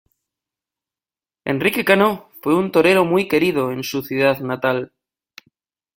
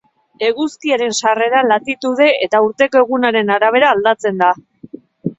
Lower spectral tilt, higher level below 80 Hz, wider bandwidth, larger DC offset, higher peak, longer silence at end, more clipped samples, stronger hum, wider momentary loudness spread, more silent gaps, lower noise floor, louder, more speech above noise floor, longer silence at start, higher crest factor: first, -5.5 dB/octave vs -3.5 dB/octave; about the same, -60 dBFS vs -62 dBFS; first, 17 kHz vs 8.4 kHz; neither; about the same, 0 dBFS vs 0 dBFS; first, 1.1 s vs 0.05 s; neither; neither; first, 10 LU vs 7 LU; neither; first, under -90 dBFS vs -37 dBFS; second, -18 LUFS vs -14 LUFS; first, over 73 dB vs 23 dB; first, 1.45 s vs 0.4 s; first, 20 dB vs 14 dB